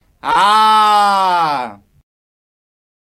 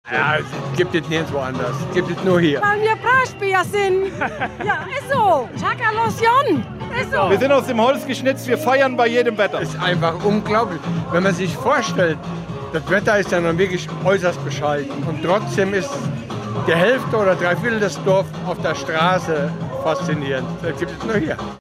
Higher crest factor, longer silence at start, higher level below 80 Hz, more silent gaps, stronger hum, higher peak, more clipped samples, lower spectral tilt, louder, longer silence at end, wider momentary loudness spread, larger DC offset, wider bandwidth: about the same, 14 dB vs 16 dB; first, 0.25 s vs 0.05 s; second, -56 dBFS vs -48 dBFS; neither; neither; first, 0 dBFS vs -4 dBFS; neither; second, -2.5 dB/octave vs -5.5 dB/octave; first, -12 LUFS vs -19 LUFS; first, 1.3 s vs 0 s; about the same, 10 LU vs 8 LU; neither; about the same, 15.5 kHz vs 16 kHz